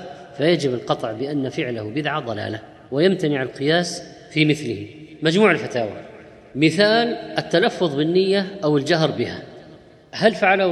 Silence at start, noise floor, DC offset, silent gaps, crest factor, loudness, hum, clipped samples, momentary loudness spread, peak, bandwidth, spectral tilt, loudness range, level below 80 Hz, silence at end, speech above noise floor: 0 s; -46 dBFS; under 0.1%; none; 20 dB; -20 LUFS; none; under 0.1%; 14 LU; -2 dBFS; 12 kHz; -5.5 dB/octave; 3 LU; -62 dBFS; 0 s; 26 dB